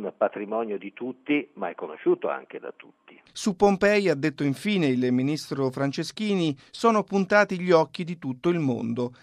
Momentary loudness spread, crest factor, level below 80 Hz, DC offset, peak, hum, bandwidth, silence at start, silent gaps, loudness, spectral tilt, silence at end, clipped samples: 12 LU; 20 dB; -62 dBFS; under 0.1%; -6 dBFS; none; 13.5 kHz; 0 s; none; -25 LUFS; -6 dB/octave; 0.1 s; under 0.1%